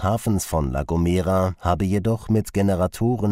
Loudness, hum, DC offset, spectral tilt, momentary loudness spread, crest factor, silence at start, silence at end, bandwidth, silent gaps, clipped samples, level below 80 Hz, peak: -22 LUFS; none; under 0.1%; -7 dB/octave; 3 LU; 14 dB; 0 s; 0 s; 16 kHz; none; under 0.1%; -36 dBFS; -6 dBFS